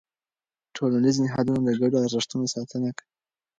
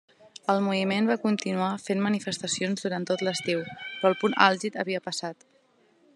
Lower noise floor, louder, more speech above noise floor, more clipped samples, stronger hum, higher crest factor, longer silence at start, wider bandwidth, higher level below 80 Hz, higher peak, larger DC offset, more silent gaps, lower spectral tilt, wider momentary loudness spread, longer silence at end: first, under -90 dBFS vs -64 dBFS; about the same, -25 LUFS vs -27 LUFS; first, over 66 dB vs 37 dB; neither; neither; second, 16 dB vs 26 dB; first, 0.75 s vs 0.5 s; second, 9 kHz vs 12 kHz; first, -64 dBFS vs -78 dBFS; second, -10 dBFS vs -2 dBFS; neither; neither; about the same, -5.5 dB/octave vs -4.5 dB/octave; about the same, 9 LU vs 9 LU; second, 0.65 s vs 0.8 s